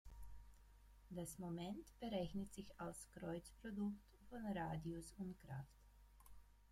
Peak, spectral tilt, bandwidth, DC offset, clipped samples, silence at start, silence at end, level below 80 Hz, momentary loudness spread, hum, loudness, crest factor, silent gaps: -32 dBFS; -6 dB/octave; 16 kHz; under 0.1%; under 0.1%; 0.05 s; 0 s; -66 dBFS; 18 LU; 50 Hz at -65 dBFS; -51 LUFS; 20 dB; none